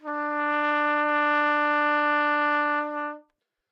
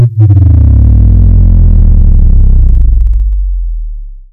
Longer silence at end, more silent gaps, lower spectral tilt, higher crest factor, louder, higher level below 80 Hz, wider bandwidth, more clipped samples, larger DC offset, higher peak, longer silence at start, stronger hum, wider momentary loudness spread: first, 0.5 s vs 0.1 s; neither; second, -2.5 dB/octave vs -12.5 dB/octave; first, 14 dB vs 4 dB; second, -24 LUFS vs -8 LUFS; second, under -90 dBFS vs -6 dBFS; first, 6.8 kHz vs 1.6 kHz; second, under 0.1% vs 10%; neither; second, -12 dBFS vs 0 dBFS; about the same, 0.05 s vs 0 s; neither; second, 7 LU vs 13 LU